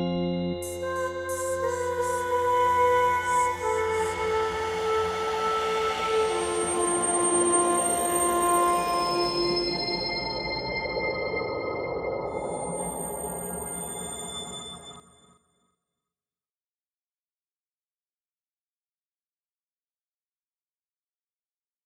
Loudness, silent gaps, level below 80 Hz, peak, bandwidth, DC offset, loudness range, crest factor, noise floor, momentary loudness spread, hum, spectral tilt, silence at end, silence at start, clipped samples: -26 LUFS; none; -54 dBFS; -10 dBFS; 15.5 kHz; under 0.1%; 12 LU; 18 dB; under -90 dBFS; 10 LU; none; -3 dB/octave; 6.85 s; 0 s; under 0.1%